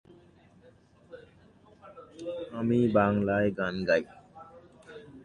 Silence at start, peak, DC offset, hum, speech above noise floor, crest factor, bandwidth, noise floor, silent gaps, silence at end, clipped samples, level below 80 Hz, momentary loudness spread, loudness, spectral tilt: 1.1 s; -10 dBFS; under 0.1%; none; 32 dB; 20 dB; 9.4 kHz; -59 dBFS; none; 0.05 s; under 0.1%; -58 dBFS; 26 LU; -28 LUFS; -8 dB/octave